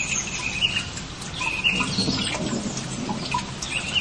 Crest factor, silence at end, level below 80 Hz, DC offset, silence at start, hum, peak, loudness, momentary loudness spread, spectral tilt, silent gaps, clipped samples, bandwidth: 16 dB; 0 s; -44 dBFS; 0.2%; 0 s; none; -10 dBFS; -25 LUFS; 8 LU; -2.5 dB/octave; none; under 0.1%; 12 kHz